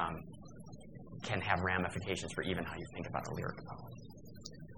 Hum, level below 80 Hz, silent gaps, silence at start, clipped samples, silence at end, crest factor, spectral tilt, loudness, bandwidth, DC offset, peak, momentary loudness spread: none; -60 dBFS; none; 0 s; under 0.1%; 0 s; 26 dB; -5 dB/octave; -39 LUFS; 17.5 kHz; 0.1%; -14 dBFS; 19 LU